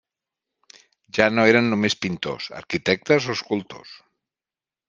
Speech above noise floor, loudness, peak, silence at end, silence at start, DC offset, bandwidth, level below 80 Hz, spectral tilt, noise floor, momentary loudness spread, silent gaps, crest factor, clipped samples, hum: over 68 dB; -21 LUFS; 0 dBFS; 0.95 s; 1.15 s; under 0.1%; 9.6 kHz; -62 dBFS; -5 dB/octave; under -90 dBFS; 13 LU; none; 24 dB; under 0.1%; none